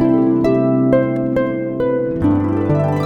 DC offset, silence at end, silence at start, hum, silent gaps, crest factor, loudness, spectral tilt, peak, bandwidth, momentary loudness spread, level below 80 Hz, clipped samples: under 0.1%; 0 s; 0 s; none; none; 14 dB; -16 LUFS; -10 dB/octave; -2 dBFS; 6.4 kHz; 4 LU; -40 dBFS; under 0.1%